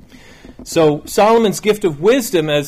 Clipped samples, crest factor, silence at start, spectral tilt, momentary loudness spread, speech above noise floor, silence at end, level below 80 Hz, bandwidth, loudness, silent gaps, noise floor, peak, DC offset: under 0.1%; 12 dB; 0.45 s; -4.5 dB/octave; 4 LU; 26 dB; 0 s; -46 dBFS; 16 kHz; -14 LUFS; none; -40 dBFS; -4 dBFS; under 0.1%